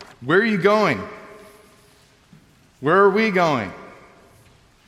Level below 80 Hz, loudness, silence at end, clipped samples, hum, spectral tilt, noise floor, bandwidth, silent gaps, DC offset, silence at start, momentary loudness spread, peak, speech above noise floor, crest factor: -62 dBFS; -18 LUFS; 1 s; under 0.1%; none; -6 dB/octave; -54 dBFS; 13 kHz; none; under 0.1%; 0 s; 19 LU; -2 dBFS; 36 dB; 18 dB